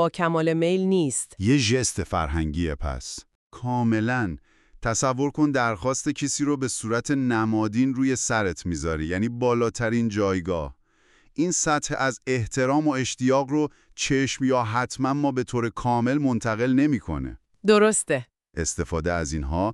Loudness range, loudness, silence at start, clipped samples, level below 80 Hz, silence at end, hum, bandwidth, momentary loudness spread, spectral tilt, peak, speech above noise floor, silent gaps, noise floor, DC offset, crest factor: 3 LU; -24 LUFS; 0 s; under 0.1%; -42 dBFS; 0 s; none; 12 kHz; 8 LU; -5 dB/octave; -6 dBFS; 36 dB; 3.35-3.50 s; -60 dBFS; under 0.1%; 18 dB